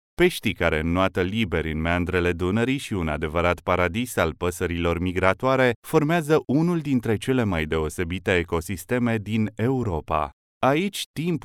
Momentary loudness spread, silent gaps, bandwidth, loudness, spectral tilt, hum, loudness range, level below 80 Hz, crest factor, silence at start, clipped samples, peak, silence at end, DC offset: 6 LU; 5.76-5.82 s, 10.33-10.61 s, 11.06-11.14 s; 17 kHz; -24 LUFS; -6 dB/octave; none; 2 LU; -40 dBFS; 20 dB; 0.2 s; under 0.1%; -2 dBFS; 0.05 s; under 0.1%